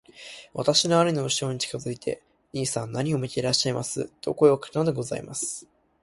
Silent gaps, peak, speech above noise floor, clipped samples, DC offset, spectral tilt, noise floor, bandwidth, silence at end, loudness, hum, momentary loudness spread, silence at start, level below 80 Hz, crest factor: none; -6 dBFS; 20 dB; under 0.1%; under 0.1%; -4 dB/octave; -45 dBFS; 11.5 kHz; 0.4 s; -25 LUFS; none; 14 LU; 0.15 s; -60 dBFS; 20 dB